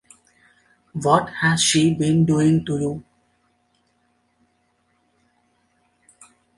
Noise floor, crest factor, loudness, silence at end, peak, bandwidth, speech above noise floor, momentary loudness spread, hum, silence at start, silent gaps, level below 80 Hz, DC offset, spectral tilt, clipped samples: -66 dBFS; 20 dB; -19 LUFS; 3.55 s; -4 dBFS; 11.5 kHz; 48 dB; 11 LU; 60 Hz at -50 dBFS; 0.95 s; none; -56 dBFS; under 0.1%; -4.5 dB/octave; under 0.1%